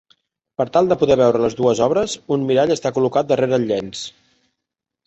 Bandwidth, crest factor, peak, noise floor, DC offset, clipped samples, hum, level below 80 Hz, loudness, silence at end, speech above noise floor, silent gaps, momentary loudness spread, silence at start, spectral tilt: 8.2 kHz; 16 dB; -2 dBFS; -82 dBFS; under 0.1%; under 0.1%; none; -54 dBFS; -18 LUFS; 0.95 s; 65 dB; none; 11 LU; 0.6 s; -5.5 dB/octave